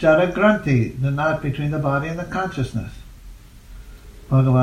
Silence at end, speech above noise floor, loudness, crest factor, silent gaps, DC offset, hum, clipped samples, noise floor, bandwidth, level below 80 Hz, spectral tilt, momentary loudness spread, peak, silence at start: 0 s; 22 dB; -20 LUFS; 18 dB; none; under 0.1%; none; under 0.1%; -41 dBFS; 10 kHz; -40 dBFS; -8 dB/octave; 10 LU; -2 dBFS; 0 s